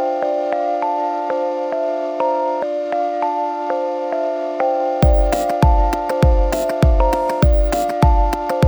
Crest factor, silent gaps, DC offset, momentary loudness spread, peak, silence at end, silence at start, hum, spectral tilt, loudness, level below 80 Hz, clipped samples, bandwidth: 16 dB; none; under 0.1%; 6 LU; -2 dBFS; 0 s; 0 s; none; -7 dB/octave; -18 LUFS; -20 dBFS; under 0.1%; over 20 kHz